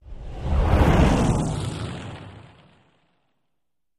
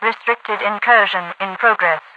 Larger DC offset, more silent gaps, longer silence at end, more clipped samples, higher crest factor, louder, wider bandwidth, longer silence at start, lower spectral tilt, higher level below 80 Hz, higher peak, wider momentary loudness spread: neither; neither; first, 1.55 s vs 0.15 s; neither; about the same, 18 dB vs 18 dB; second, -22 LUFS vs -16 LUFS; first, 13 kHz vs 8 kHz; about the same, 0.05 s vs 0 s; first, -7 dB/octave vs -4.5 dB/octave; first, -28 dBFS vs -82 dBFS; second, -4 dBFS vs 0 dBFS; first, 22 LU vs 8 LU